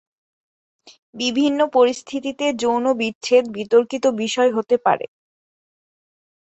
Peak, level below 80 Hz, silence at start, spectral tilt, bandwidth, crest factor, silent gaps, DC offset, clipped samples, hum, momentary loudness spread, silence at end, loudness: -2 dBFS; -66 dBFS; 0.85 s; -3.5 dB/octave; 8.2 kHz; 18 dB; 0.99-1.13 s, 3.15-3.21 s; under 0.1%; under 0.1%; none; 7 LU; 1.45 s; -19 LUFS